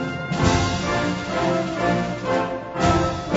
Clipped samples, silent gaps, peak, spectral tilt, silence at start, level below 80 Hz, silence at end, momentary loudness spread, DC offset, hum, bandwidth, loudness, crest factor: under 0.1%; none; -4 dBFS; -5.5 dB/octave; 0 s; -38 dBFS; 0 s; 4 LU; under 0.1%; none; 8 kHz; -22 LUFS; 18 dB